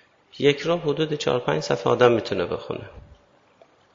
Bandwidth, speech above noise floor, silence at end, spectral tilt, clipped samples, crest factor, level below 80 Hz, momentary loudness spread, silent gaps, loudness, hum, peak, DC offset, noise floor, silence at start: 7.6 kHz; 34 dB; 0.95 s; -5.5 dB/octave; under 0.1%; 22 dB; -56 dBFS; 13 LU; none; -22 LUFS; none; -2 dBFS; under 0.1%; -57 dBFS; 0.35 s